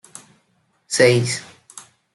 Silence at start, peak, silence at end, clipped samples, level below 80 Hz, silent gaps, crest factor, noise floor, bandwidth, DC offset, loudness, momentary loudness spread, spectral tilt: 0.9 s; -2 dBFS; 0.35 s; under 0.1%; -62 dBFS; none; 20 dB; -65 dBFS; 12 kHz; under 0.1%; -18 LUFS; 26 LU; -4 dB/octave